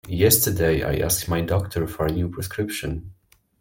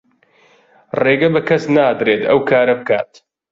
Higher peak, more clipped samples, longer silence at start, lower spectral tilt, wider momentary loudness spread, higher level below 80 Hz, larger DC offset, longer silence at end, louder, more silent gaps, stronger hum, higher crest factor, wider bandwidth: about the same, -2 dBFS vs -2 dBFS; neither; second, 0.05 s vs 0.95 s; second, -4.5 dB/octave vs -7 dB/octave; first, 11 LU vs 6 LU; first, -40 dBFS vs -56 dBFS; neither; about the same, 0.5 s vs 0.5 s; second, -22 LUFS vs -15 LUFS; neither; neither; first, 20 dB vs 14 dB; first, 17 kHz vs 7.6 kHz